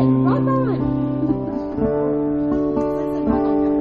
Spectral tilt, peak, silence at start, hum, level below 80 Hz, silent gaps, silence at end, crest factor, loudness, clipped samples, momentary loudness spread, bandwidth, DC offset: -9.5 dB/octave; -6 dBFS; 0 s; none; -40 dBFS; none; 0 s; 12 dB; -20 LUFS; under 0.1%; 4 LU; 5 kHz; under 0.1%